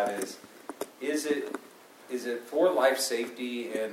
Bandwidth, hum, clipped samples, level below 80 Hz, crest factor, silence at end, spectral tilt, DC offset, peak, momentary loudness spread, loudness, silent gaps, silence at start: 16 kHz; none; under 0.1%; -86 dBFS; 20 dB; 0 s; -2.5 dB/octave; under 0.1%; -10 dBFS; 16 LU; -30 LUFS; none; 0 s